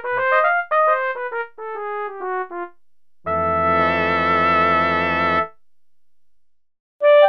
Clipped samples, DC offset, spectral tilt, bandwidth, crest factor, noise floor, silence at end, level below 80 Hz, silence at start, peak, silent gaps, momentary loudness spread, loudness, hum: under 0.1%; 0.5%; -7 dB/octave; 6.4 kHz; 18 dB; -83 dBFS; 0 s; -52 dBFS; 0 s; -2 dBFS; 6.80-7.00 s; 14 LU; -19 LUFS; none